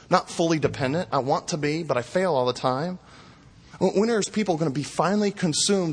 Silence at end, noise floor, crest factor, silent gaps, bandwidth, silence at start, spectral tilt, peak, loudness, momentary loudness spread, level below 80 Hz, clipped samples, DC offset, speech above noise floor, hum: 0 s; -50 dBFS; 20 dB; none; 10.5 kHz; 0.1 s; -4.5 dB/octave; -4 dBFS; -24 LUFS; 5 LU; -58 dBFS; under 0.1%; under 0.1%; 26 dB; none